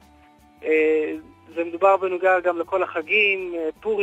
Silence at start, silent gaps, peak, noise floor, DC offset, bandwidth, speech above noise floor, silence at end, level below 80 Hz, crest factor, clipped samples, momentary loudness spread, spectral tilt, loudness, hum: 0.6 s; none; -6 dBFS; -53 dBFS; under 0.1%; 8 kHz; 31 dB; 0 s; -62 dBFS; 16 dB; under 0.1%; 12 LU; -5 dB/octave; -21 LUFS; none